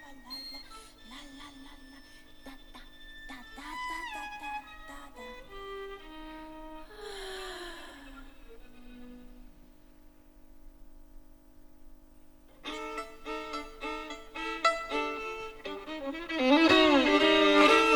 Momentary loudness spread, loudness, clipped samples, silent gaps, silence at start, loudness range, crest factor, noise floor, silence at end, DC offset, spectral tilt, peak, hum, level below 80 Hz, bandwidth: 29 LU; -29 LUFS; under 0.1%; none; 0 s; 22 LU; 22 dB; -55 dBFS; 0 s; under 0.1%; -3 dB/octave; -10 dBFS; none; -54 dBFS; over 20 kHz